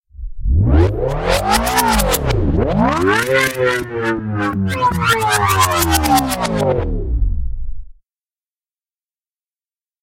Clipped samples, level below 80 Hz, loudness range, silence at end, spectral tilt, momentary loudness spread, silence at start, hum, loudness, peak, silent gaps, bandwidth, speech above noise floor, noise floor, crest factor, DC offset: under 0.1%; -24 dBFS; 8 LU; 2.15 s; -4.5 dB/octave; 8 LU; 0.15 s; none; -16 LUFS; 0 dBFS; none; 16.5 kHz; over 73 dB; under -90 dBFS; 16 dB; under 0.1%